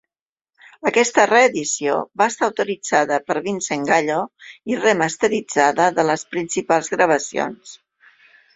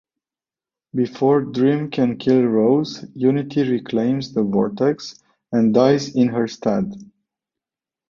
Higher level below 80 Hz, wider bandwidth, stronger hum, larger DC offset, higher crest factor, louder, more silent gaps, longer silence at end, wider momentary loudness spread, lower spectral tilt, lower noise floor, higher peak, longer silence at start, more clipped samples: about the same, -64 dBFS vs -60 dBFS; first, 8.4 kHz vs 7.2 kHz; neither; neither; about the same, 18 dB vs 18 dB; about the same, -19 LUFS vs -19 LUFS; neither; second, 0.8 s vs 1.05 s; about the same, 10 LU vs 8 LU; second, -3 dB/octave vs -7.5 dB/octave; about the same, under -90 dBFS vs under -90 dBFS; about the same, 0 dBFS vs -2 dBFS; about the same, 0.85 s vs 0.95 s; neither